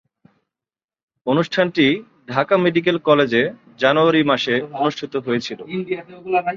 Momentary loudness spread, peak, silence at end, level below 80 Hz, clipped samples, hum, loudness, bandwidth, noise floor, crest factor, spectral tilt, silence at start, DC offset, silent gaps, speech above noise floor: 11 LU; -2 dBFS; 0 s; -62 dBFS; under 0.1%; none; -19 LUFS; 7.4 kHz; under -90 dBFS; 18 dB; -6 dB/octave; 1.25 s; under 0.1%; none; over 72 dB